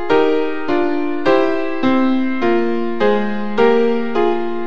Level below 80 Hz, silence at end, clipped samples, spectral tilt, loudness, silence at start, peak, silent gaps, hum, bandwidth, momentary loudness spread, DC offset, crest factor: -56 dBFS; 0 s; under 0.1%; -7 dB/octave; -17 LUFS; 0 s; 0 dBFS; none; none; 7.2 kHz; 5 LU; 8%; 14 dB